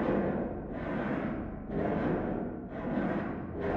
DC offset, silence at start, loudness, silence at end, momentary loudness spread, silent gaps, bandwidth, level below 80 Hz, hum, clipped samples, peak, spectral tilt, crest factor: under 0.1%; 0 s; -34 LUFS; 0 s; 7 LU; none; 5.6 kHz; -48 dBFS; none; under 0.1%; -16 dBFS; -10 dB/octave; 16 dB